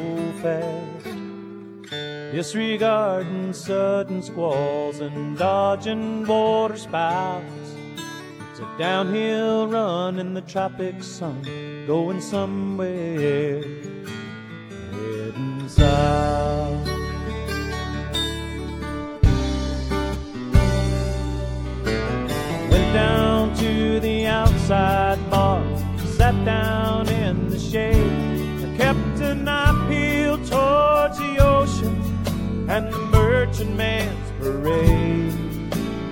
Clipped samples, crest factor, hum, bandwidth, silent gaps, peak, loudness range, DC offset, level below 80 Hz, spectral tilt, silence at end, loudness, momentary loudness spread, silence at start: under 0.1%; 22 dB; none; 17.5 kHz; none; 0 dBFS; 6 LU; under 0.1%; -30 dBFS; -6.5 dB/octave; 0 s; -22 LUFS; 13 LU; 0 s